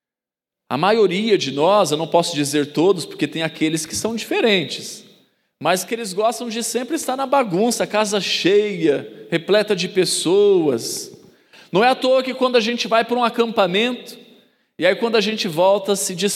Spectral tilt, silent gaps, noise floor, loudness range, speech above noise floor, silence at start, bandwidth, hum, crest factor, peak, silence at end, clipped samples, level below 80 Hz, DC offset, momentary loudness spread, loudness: -3.5 dB/octave; none; -89 dBFS; 4 LU; 71 dB; 0.7 s; 16 kHz; none; 18 dB; -2 dBFS; 0 s; under 0.1%; -70 dBFS; under 0.1%; 8 LU; -19 LUFS